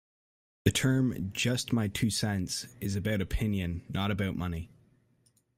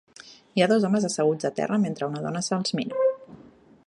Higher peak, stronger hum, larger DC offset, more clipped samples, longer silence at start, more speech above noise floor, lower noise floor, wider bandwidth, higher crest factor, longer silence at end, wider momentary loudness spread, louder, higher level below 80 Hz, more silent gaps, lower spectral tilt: second, -10 dBFS vs -6 dBFS; neither; neither; neither; first, 0.65 s vs 0.25 s; first, 39 dB vs 28 dB; first, -69 dBFS vs -52 dBFS; first, 16 kHz vs 11.5 kHz; about the same, 22 dB vs 20 dB; first, 0.9 s vs 0.5 s; about the same, 8 LU vs 8 LU; second, -31 LUFS vs -25 LUFS; first, -48 dBFS vs -70 dBFS; neither; about the same, -5 dB/octave vs -5 dB/octave